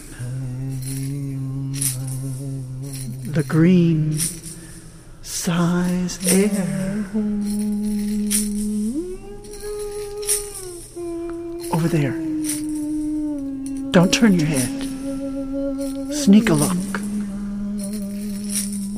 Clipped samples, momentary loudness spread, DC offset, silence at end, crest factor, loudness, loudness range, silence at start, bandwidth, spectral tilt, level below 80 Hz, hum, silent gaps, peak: under 0.1%; 14 LU; under 0.1%; 0 s; 20 dB; -22 LUFS; 5 LU; 0 s; 15.5 kHz; -5 dB/octave; -40 dBFS; none; none; -2 dBFS